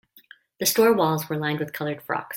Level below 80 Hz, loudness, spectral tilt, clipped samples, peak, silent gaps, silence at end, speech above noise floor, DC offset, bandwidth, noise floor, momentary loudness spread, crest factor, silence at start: -66 dBFS; -23 LUFS; -4 dB/octave; under 0.1%; -6 dBFS; none; 0 s; 30 dB; under 0.1%; 16.5 kHz; -53 dBFS; 11 LU; 18 dB; 0.6 s